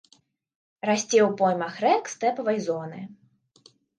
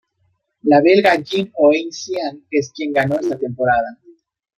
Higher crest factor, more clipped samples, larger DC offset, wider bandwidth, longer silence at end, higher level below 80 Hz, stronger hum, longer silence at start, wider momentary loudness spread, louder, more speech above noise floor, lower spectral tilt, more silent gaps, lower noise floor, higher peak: about the same, 18 dB vs 16 dB; neither; neither; second, 10 kHz vs 14.5 kHz; first, 0.85 s vs 0.65 s; second, -78 dBFS vs -58 dBFS; neither; first, 0.85 s vs 0.65 s; about the same, 14 LU vs 12 LU; second, -24 LUFS vs -17 LUFS; second, 39 dB vs 50 dB; second, -4 dB/octave vs -5.5 dB/octave; neither; about the same, -63 dBFS vs -66 dBFS; second, -8 dBFS vs -2 dBFS